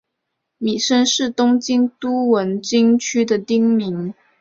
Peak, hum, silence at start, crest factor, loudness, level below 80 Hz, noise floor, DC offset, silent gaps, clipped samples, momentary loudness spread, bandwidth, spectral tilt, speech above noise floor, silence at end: -4 dBFS; none; 0.6 s; 14 dB; -17 LUFS; -62 dBFS; -77 dBFS; under 0.1%; none; under 0.1%; 8 LU; 8 kHz; -4 dB/octave; 60 dB; 0.3 s